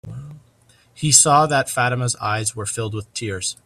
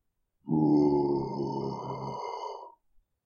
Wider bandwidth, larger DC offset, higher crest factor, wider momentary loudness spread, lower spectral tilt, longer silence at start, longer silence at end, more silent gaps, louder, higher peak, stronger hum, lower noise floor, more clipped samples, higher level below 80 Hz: first, 16 kHz vs 6.8 kHz; neither; about the same, 20 dB vs 16 dB; about the same, 16 LU vs 16 LU; second, -2.5 dB/octave vs -9 dB/octave; second, 0.05 s vs 0.45 s; second, 0.1 s vs 0.55 s; neither; first, -18 LUFS vs -29 LUFS; first, 0 dBFS vs -14 dBFS; neither; second, -55 dBFS vs -67 dBFS; neither; first, -54 dBFS vs -60 dBFS